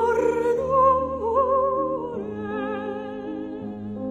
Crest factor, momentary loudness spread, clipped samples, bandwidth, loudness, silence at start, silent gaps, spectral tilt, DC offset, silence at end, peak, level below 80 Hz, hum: 16 dB; 13 LU; under 0.1%; 12 kHz; -24 LUFS; 0 s; none; -7.5 dB/octave; under 0.1%; 0 s; -8 dBFS; -48 dBFS; none